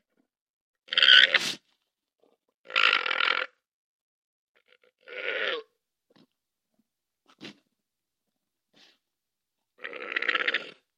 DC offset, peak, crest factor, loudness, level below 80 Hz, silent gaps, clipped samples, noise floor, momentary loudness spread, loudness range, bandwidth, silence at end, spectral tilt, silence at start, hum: under 0.1%; 0 dBFS; 30 dB; -23 LUFS; -86 dBFS; 2.54-2.64 s, 3.73-4.55 s; under 0.1%; -87 dBFS; 23 LU; 15 LU; 16 kHz; 0.3 s; 0.5 dB/octave; 0.9 s; none